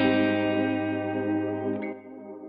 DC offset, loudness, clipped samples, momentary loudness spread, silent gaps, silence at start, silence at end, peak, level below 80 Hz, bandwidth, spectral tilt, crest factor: under 0.1%; -27 LUFS; under 0.1%; 13 LU; none; 0 s; 0 s; -10 dBFS; -64 dBFS; 5 kHz; -10.5 dB/octave; 18 dB